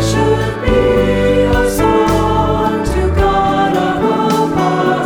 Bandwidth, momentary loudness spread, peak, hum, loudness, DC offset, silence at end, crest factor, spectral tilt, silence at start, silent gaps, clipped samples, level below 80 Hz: 19.5 kHz; 3 LU; 0 dBFS; none; -13 LUFS; under 0.1%; 0 s; 12 dB; -6 dB/octave; 0 s; none; under 0.1%; -24 dBFS